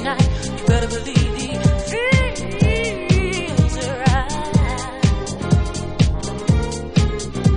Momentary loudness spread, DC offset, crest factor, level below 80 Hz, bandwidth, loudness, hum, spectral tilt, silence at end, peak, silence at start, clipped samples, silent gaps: 3 LU; under 0.1%; 16 dB; -24 dBFS; 10.5 kHz; -19 LUFS; none; -5.5 dB/octave; 0 s; -2 dBFS; 0 s; under 0.1%; none